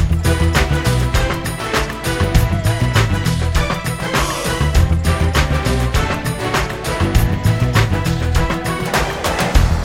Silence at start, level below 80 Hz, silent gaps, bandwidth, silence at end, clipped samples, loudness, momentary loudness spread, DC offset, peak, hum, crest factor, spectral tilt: 0 s; -20 dBFS; none; 17 kHz; 0 s; under 0.1%; -17 LUFS; 4 LU; under 0.1%; 0 dBFS; none; 16 dB; -5 dB/octave